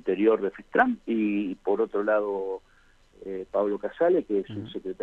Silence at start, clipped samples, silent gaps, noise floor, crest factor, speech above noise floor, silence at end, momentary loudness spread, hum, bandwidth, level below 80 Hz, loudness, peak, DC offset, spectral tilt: 0.05 s; under 0.1%; none; -58 dBFS; 20 dB; 32 dB; 0 s; 13 LU; none; 7 kHz; -60 dBFS; -27 LUFS; -6 dBFS; under 0.1%; -8 dB/octave